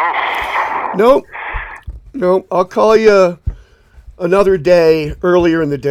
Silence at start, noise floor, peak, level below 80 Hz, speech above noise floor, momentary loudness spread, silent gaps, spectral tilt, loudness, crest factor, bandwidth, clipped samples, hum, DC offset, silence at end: 0 s; -42 dBFS; 0 dBFS; -34 dBFS; 31 dB; 15 LU; none; -6.5 dB/octave; -13 LUFS; 12 dB; 15 kHz; under 0.1%; none; under 0.1%; 0 s